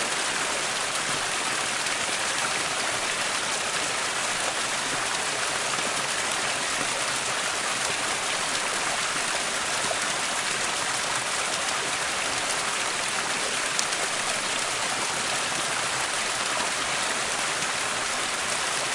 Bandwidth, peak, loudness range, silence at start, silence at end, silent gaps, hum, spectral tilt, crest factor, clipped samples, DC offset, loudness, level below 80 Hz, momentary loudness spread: 11.5 kHz; -2 dBFS; 0 LU; 0 s; 0 s; none; none; 0 dB/octave; 26 dB; under 0.1%; under 0.1%; -25 LUFS; -60 dBFS; 1 LU